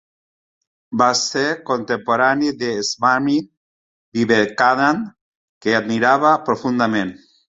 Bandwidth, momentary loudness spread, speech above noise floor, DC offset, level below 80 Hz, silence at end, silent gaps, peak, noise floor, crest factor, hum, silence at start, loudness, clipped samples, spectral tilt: 8 kHz; 8 LU; over 73 dB; under 0.1%; -60 dBFS; 0.4 s; 3.57-4.12 s, 5.21-5.61 s; -2 dBFS; under -90 dBFS; 18 dB; none; 0.9 s; -18 LUFS; under 0.1%; -4 dB/octave